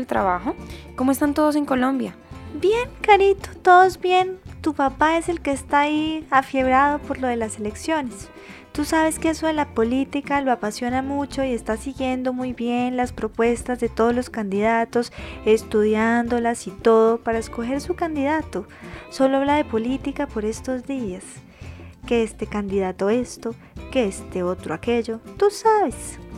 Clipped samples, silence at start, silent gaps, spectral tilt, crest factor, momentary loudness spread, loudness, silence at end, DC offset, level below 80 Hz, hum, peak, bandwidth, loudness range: under 0.1%; 0 s; none; -5 dB/octave; 20 dB; 14 LU; -21 LUFS; 0 s; under 0.1%; -44 dBFS; none; -2 dBFS; 15.5 kHz; 7 LU